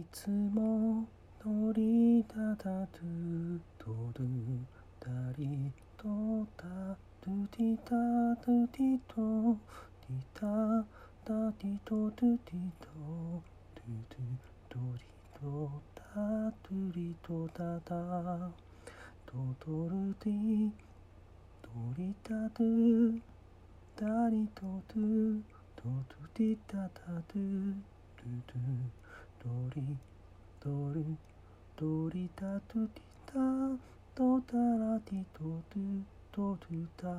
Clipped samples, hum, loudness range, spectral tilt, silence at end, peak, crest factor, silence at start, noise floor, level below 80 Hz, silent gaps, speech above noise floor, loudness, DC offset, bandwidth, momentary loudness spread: under 0.1%; none; 7 LU; -9 dB/octave; 0 s; -20 dBFS; 16 dB; 0 s; -57 dBFS; -60 dBFS; none; 22 dB; -36 LUFS; under 0.1%; 11 kHz; 15 LU